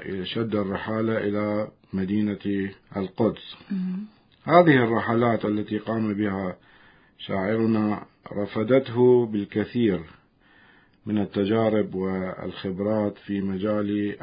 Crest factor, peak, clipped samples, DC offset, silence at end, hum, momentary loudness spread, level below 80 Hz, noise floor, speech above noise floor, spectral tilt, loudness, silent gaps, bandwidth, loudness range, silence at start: 24 dB; -2 dBFS; under 0.1%; under 0.1%; 0.05 s; none; 13 LU; -56 dBFS; -57 dBFS; 33 dB; -11.5 dB/octave; -25 LUFS; none; 5.2 kHz; 4 LU; 0 s